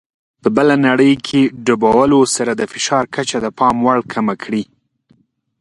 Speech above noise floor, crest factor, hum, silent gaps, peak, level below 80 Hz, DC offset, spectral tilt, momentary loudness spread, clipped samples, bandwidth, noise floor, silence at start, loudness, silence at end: 42 dB; 16 dB; none; none; 0 dBFS; -50 dBFS; under 0.1%; -4.5 dB/octave; 9 LU; under 0.1%; 11.5 kHz; -56 dBFS; 0.45 s; -15 LUFS; 0.95 s